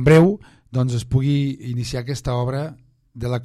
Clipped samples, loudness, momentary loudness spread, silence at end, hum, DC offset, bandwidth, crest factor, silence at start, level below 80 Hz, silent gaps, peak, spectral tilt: under 0.1%; -21 LUFS; 13 LU; 0 s; none; under 0.1%; 12.5 kHz; 16 dB; 0 s; -42 dBFS; none; -4 dBFS; -7.5 dB/octave